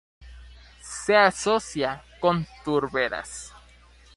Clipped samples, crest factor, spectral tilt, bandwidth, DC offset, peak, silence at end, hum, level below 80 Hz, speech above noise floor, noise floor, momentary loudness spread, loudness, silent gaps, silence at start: under 0.1%; 22 dB; -4 dB/octave; 11.5 kHz; under 0.1%; -4 dBFS; 0.6 s; none; -52 dBFS; 29 dB; -53 dBFS; 19 LU; -24 LUFS; none; 0.2 s